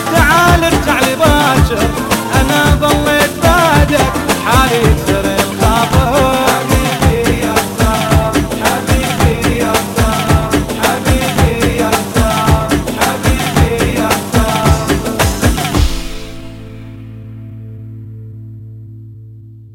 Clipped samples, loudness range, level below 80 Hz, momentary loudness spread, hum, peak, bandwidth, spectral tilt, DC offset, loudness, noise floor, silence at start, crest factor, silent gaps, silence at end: under 0.1%; 8 LU; -20 dBFS; 20 LU; none; 0 dBFS; 16.5 kHz; -4.5 dB/octave; under 0.1%; -12 LUFS; -34 dBFS; 0 s; 12 dB; none; 0 s